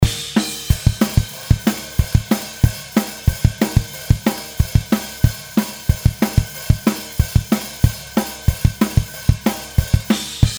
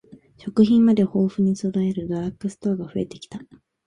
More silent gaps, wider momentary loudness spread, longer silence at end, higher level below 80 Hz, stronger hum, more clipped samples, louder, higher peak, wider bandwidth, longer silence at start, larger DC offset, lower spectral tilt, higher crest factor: neither; second, 4 LU vs 20 LU; second, 0 s vs 0.45 s; first, -24 dBFS vs -56 dBFS; neither; first, 0.1% vs under 0.1%; first, -19 LUFS vs -22 LUFS; first, 0 dBFS vs -4 dBFS; first, over 20 kHz vs 10 kHz; about the same, 0 s vs 0.1 s; neither; second, -5.5 dB/octave vs -8 dB/octave; about the same, 18 dB vs 18 dB